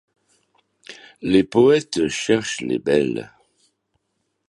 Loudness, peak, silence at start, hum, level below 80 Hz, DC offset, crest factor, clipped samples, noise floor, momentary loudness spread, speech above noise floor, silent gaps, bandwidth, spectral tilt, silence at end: -19 LUFS; -2 dBFS; 0.9 s; none; -56 dBFS; under 0.1%; 20 dB; under 0.1%; -74 dBFS; 20 LU; 55 dB; none; 11.5 kHz; -5 dB/octave; 1.2 s